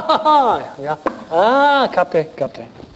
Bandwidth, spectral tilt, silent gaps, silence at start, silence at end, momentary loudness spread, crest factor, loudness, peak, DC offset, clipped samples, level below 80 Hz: 8.2 kHz; -5.5 dB/octave; none; 0 s; 0.15 s; 13 LU; 14 dB; -16 LUFS; -2 dBFS; under 0.1%; under 0.1%; -56 dBFS